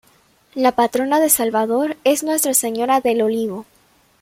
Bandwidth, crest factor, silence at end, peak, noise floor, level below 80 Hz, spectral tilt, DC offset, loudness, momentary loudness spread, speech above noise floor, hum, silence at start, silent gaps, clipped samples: 16.5 kHz; 18 dB; 0.6 s; 0 dBFS; -56 dBFS; -62 dBFS; -2.5 dB/octave; under 0.1%; -17 LUFS; 8 LU; 38 dB; none; 0.55 s; none; under 0.1%